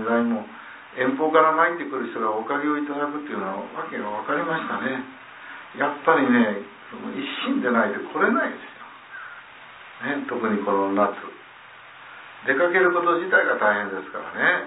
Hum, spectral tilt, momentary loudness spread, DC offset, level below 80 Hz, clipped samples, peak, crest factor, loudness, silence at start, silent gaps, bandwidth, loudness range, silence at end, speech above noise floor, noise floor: none; -9 dB/octave; 22 LU; under 0.1%; -76 dBFS; under 0.1%; -4 dBFS; 20 dB; -23 LUFS; 0 s; none; 4 kHz; 5 LU; 0 s; 22 dB; -45 dBFS